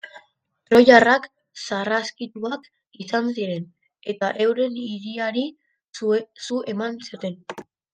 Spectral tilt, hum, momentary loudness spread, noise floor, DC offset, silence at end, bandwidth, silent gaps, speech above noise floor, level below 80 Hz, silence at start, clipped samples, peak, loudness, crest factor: -4.5 dB/octave; none; 22 LU; -64 dBFS; under 0.1%; 0.3 s; 9.6 kHz; 5.89-5.93 s; 43 dB; -66 dBFS; 0.05 s; under 0.1%; 0 dBFS; -21 LUFS; 22 dB